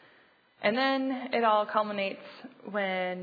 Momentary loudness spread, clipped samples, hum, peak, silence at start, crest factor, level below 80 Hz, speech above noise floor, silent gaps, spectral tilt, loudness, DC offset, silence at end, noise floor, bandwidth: 14 LU; under 0.1%; none; -10 dBFS; 0.6 s; 20 dB; -88 dBFS; 33 dB; none; -7 dB/octave; -29 LUFS; under 0.1%; 0 s; -62 dBFS; 5 kHz